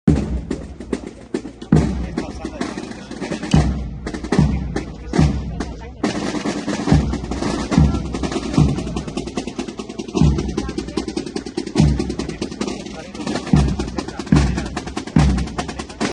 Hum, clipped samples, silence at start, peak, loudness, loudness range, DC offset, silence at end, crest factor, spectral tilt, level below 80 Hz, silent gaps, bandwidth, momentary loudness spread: none; under 0.1%; 0.05 s; 0 dBFS; -21 LUFS; 2 LU; under 0.1%; 0 s; 20 dB; -6.5 dB/octave; -28 dBFS; none; 10.5 kHz; 12 LU